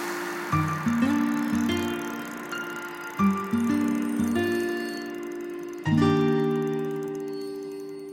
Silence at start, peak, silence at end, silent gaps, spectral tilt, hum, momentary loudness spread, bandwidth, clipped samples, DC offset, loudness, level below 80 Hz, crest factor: 0 s; -10 dBFS; 0 s; none; -6 dB/octave; none; 11 LU; 17 kHz; under 0.1%; under 0.1%; -27 LUFS; -60 dBFS; 18 dB